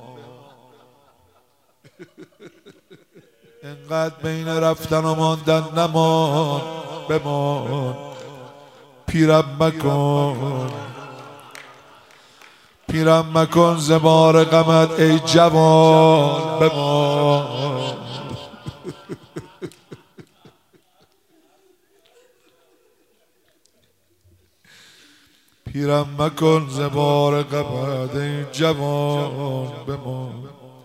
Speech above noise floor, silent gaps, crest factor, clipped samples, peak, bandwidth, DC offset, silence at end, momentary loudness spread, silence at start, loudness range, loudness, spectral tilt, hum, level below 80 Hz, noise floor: 45 dB; none; 20 dB; under 0.1%; 0 dBFS; 15.5 kHz; under 0.1%; 0.15 s; 24 LU; 0 s; 15 LU; -18 LUFS; -6 dB/octave; none; -54 dBFS; -63 dBFS